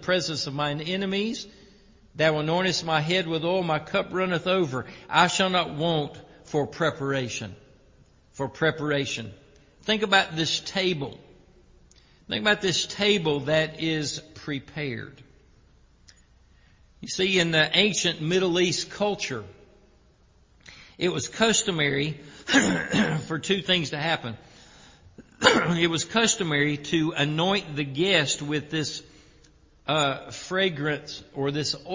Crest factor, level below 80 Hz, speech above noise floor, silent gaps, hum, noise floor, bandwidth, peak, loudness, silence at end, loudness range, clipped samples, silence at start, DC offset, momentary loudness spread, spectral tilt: 26 dB; -58 dBFS; 34 dB; none; none; -59 dBFS; 7.8 kHz; -2 dBFS; -25 LUFS; 0 s; 5 LU; under 0.1%; 0 s; under 0.1%; 13 LU; -3.5 dB/octave